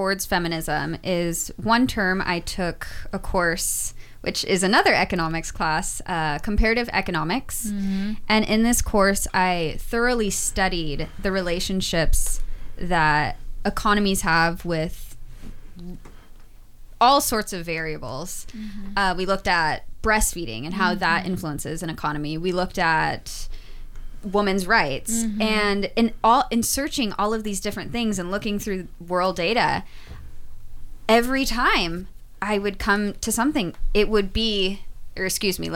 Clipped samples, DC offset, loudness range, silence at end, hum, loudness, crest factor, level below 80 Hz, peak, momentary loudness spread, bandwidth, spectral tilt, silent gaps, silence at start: under 0.1%; under 0.1%; 3 LU; 0 s; none; -23 LUFS; 18 dB; -32 dBFS; -6 dBFS; 12 LU; 17 kHz; -3.5 dB/octave; none; 0 s